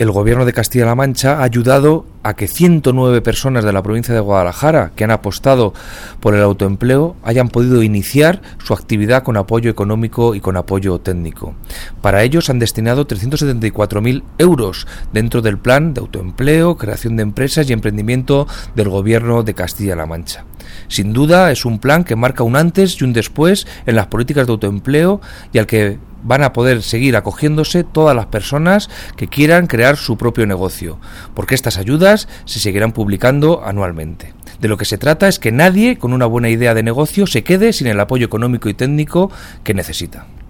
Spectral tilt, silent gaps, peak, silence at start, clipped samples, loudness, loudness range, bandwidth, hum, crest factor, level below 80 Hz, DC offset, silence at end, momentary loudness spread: -6 dB/octave; none; 0 dBFS; 0 s; under 0.1%; -14 LUFS; 3 LU; 19 kHz; none; 14 dB; -32 dBFS; under 0.1%; 0.05 s; 10 LU